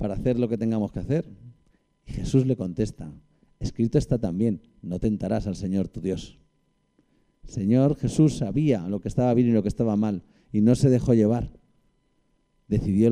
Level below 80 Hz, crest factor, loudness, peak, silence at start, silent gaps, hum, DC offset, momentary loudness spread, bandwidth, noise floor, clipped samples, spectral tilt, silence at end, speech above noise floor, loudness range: -44 dBFS; 18 dB; -25 LUFS; -8 dBFS; 0 s; none; none; under 0.1%; 14 LU; 11 kHz; -69 dBFS; under 0.1%; -8.5 dB/octave; 0 s; 46 dB; 6 LU